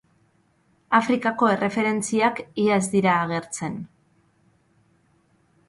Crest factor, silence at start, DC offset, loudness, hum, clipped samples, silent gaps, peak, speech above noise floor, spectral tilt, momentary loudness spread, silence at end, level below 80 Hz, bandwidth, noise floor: 20 dB; 0.9 s; under 0.1%; -22 LUFS; none; under 0.1%; none; -4 dBFS; 42 dB; -5 dB/octave; 10 LU; 1.8 s; -64 dBFS; 11.5 kHz; -64 dBFS